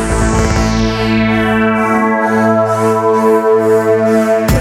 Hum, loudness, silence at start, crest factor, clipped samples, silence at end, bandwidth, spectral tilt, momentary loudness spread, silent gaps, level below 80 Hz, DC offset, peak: none; -12 LUFS; 0 s; 10 dB; under 0.1%; 0 s; 16 kHz; -6 dB/octave; 2 LU; none; -24 dBFS; under 0.1%; 0 dBFS